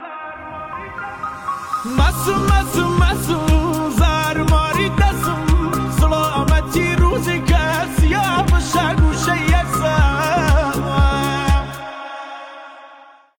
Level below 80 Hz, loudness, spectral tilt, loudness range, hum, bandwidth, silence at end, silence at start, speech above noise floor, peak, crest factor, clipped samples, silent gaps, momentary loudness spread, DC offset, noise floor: -20 dBFS; -17 LUFS; -5.5 dB/octave; 2 LU; none; 18 kHz; 0.45 s; 0 s; 29 dB; -4 dBFS; 12 dB; under 0.1%; none; 14 LU; under 0.1%; -44 dBFS